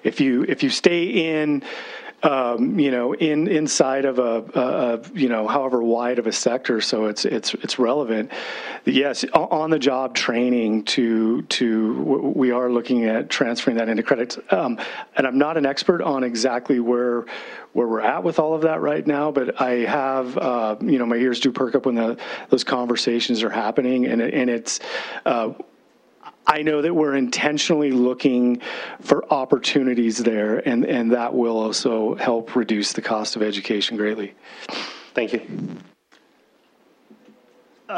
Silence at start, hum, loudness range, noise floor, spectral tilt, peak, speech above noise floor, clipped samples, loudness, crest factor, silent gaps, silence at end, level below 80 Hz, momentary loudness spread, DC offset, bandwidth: 0.05 s; none; 3 LU; -59 dBFS; -4 dB/octave; 0 dBFS; 38 dB; under 0.1%; -21 LUFS; 22 dB; none; 0 s; -68 dBFS; 6 LU; under 0.1%; 10.5 kHz